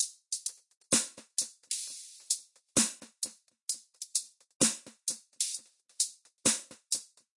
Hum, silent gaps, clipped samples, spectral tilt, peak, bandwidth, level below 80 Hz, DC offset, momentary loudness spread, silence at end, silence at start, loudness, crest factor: none; 0.77-0.81 s, 4.55-4.60 s; under 0.1%; -0.5 dB/octave; -12 dBFS; 11.5 kHz; -74 dBFS; under 0.1%; 10 LU; 0.3 s; 0 s; -32 LUFS; 24 dB